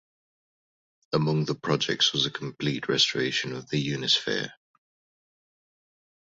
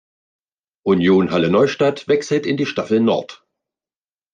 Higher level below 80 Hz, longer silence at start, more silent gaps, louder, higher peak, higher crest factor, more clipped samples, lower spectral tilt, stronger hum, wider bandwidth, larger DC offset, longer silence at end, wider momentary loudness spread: about the same, -66 dBFS vs -62 dBFS; first, 1.1 s vs 0.85 s; neither; second, -26 LUFS vs -17 LUFS; second, -8 dBFS vs -4 dBFS; about the same, 20 dB vs 16 dB; neither; second, -4 dB/octave vs -6.5 dB/octave; neither; second, 7.8 kHz vs 9.4 kHz; neither; first, 1.75 s vs 1 s; about the same, 8 LU vs 7 LU